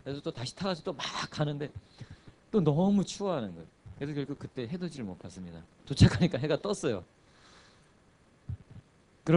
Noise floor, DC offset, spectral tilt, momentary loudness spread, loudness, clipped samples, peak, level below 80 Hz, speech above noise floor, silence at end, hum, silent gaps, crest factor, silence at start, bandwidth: -63 dBFS; under 0.1%; -6.5 dB/octave; 23 LU; -31 LUFS; under 0.1%; -8 dBFS; -52 dBFS; 32 dB; 0 s; none; none; 24 dB; 0.05 s; 11 kHz